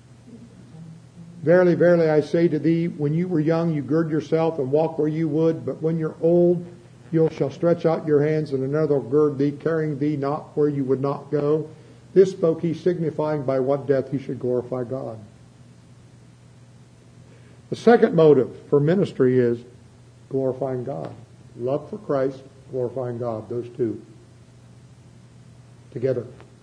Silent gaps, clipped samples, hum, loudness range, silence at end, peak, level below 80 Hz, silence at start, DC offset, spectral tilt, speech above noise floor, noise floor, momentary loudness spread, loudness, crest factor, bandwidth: none; under 0.1%; none; 10 LU; 0.2 s; -2 dBFS; -62 dBFS; 0.3 s; under 0.1%; -9 dB/octave; 28 dB; -49 dBFS; 13 LU; -22 LUFS; 20 dB; 9.8 kHz